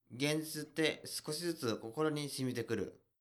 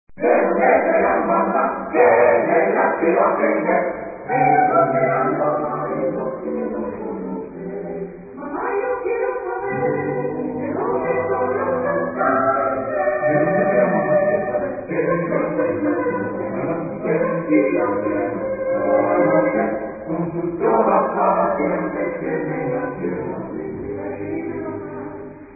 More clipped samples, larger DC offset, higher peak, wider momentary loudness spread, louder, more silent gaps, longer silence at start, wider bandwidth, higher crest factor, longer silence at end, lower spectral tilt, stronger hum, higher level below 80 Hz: neither; neither; second, -18 dBFS vs -2 dBFS; second, 5 LU vs 12 LU; second, -38 LUFS vs -20 LUFS; neither; about the same, 0.1 s vs 0.1 s; first, 19.5 kHz vs 2.7 kHz; about the same, 20 dB vs 18 dB; first, 0.25 s vs 0 s; second, -4.5 dB/octave vs -15 dB/octave; neither; second, -76 dBFS vs -52 dBFS